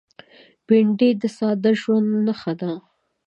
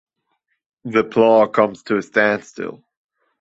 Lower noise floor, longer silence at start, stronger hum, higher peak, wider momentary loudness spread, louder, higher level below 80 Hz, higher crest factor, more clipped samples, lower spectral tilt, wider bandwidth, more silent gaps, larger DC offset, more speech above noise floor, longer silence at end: second, -50 dBFS vs -71 dBFS; second, 0.7 s vs 0.85 s; neither; about the same, -4 dBFS vs -2 dBFS; second, 10 LU vs 17 LU; second, -20 LUFS vs -17 LUFS; second, -72 dBFS vs -64 dBFS; about the same, 16 dB vs 18 dB; neither; first, -7.5 dB/octave vs -6 dB/octave; about the same, 8 kHz vs 7.8 kHz; neither; neither; second, 31 dB vs 54 dB; second, 0.45 s vs 0.65 s